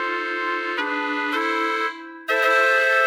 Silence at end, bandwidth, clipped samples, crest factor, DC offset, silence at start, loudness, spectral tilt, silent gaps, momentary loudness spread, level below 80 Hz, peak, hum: 0 s; 19 kHz; under 0.1%; 16 dB; under 0.1%; 0 s; -21 LUFS; -0.5 dB/octave; none; 8 LU; -80 dBFS; -6 dBFS; none